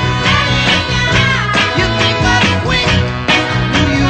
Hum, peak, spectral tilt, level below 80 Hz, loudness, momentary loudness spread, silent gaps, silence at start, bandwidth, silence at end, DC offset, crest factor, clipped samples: none; 0 dBFS; -4.5 dB/octave; -26 dBFS; -12 LUFS; 2 LU; none; 0 s; 9 kHz; 0 s; under 0.1%; 12 dB; under 0.1%